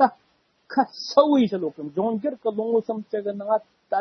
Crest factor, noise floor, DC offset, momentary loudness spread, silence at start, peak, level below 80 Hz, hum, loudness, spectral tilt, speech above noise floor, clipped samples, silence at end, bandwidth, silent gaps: 20 dB; -65 dBFS; under 0.1%; 10 LU; 0 s; -4 dBFS; -74 dBFS; none; -24 LUFS; -6 dB/octave; 42 dB; under 0.1%; 0 s; 6.4 kHz; none